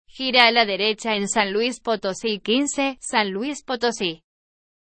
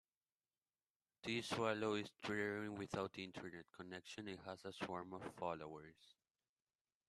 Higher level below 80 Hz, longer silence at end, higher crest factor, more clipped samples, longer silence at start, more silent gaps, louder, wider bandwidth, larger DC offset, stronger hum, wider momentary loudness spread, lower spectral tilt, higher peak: first, -60 dBFS vs -80 dBFS; second, 0.7 s vs 0.95 s; about the same, 22 dB vs 24 dB; neither; second, 0.15 s vs 1.25 s; neither; first, -21 LUFS vs -46 LUFS; second, 11 kHz vs 13 kHz; neither; neither; about the same, 11 LU vs 13 LU; second, -2.5 dB/octave vs -5 dB/octave; first, 0 dBFS vs -26 dBFS